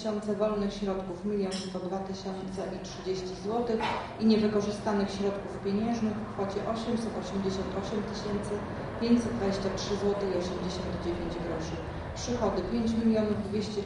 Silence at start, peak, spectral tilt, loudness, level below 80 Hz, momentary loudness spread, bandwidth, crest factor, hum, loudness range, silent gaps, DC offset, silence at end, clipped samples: 0 s; -14 dBFS; -6 dB/octave; -31 LUFS; -48 dBFS; 8 LU; 11 kHz; 18 dB; none; 3 LU; none; under 0.1%; 0 s; under 0.1%